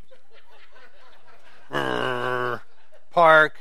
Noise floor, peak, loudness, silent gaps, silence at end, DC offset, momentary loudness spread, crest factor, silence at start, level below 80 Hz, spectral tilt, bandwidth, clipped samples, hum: -58 dBFS; -2 dBFS; -21 LUFS; none; 0.1 s; 2%; 15 LU; 22 dB; 1.7 s; -68 dBFS; -5 dB/octave; 13.5 kHz; under 0.1%; none